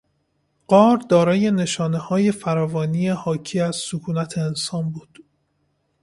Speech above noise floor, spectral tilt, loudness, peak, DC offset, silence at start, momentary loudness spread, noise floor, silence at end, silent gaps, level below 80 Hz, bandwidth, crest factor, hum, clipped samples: 49 dB; -6 dB/octave; -20 LUFS; -2 dBFS; under 0.1%; 0.7 s; 10 LU; -69 dBFS; 1 s; none; -60 dBFS; 11.5 kHz; 20 dB; none; under 0.1%